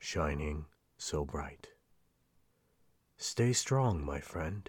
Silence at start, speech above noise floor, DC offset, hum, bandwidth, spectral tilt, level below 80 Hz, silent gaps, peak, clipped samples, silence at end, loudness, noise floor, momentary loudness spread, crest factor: 0 s; 38 dB; under 0.1%; none; 17 kHz; -4.5 dB/octave; -48 dBFS; none; -18 dBFS; under 0.1%; 0.05 s; -35 LUFS; -73 dBFS; 13 LU; 18 dB